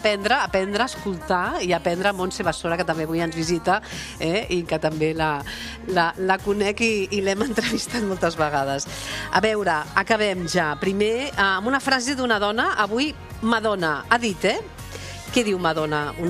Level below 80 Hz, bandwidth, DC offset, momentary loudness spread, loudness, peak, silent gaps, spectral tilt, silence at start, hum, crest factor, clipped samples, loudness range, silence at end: -46 dBFS; 15 kHz; under 0.1%; 6 LU; -22 LUFS; -2 dBFS; none; -4 dB/octave; 0 s; none; 20 dB; under 0.1%; 2 LU; 0 s